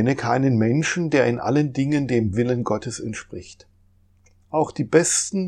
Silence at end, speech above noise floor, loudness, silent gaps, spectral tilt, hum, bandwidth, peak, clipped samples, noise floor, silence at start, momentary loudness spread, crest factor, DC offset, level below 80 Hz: 0 s; 36 dB; -21 LUFS; none; -5 dB/octave; none; 13.5 kHz; -2 dBFS; under 0.1%; -57 dBFS; 0 s; 11 LU; 20 dB; under 0.1%; -54 dBFS